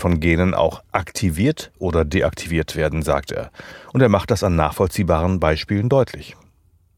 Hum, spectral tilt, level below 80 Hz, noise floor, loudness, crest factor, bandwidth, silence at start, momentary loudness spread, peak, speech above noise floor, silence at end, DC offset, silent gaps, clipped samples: none; -6.5 dB/octave; -34 dBFS; -57 dBFS; -20 LUFS; 18 dB; 18 kHz; 0 s; 8 LU; -2 dBFS; 38 dB; 0.65 s; under 0.1%; none; under 0.1%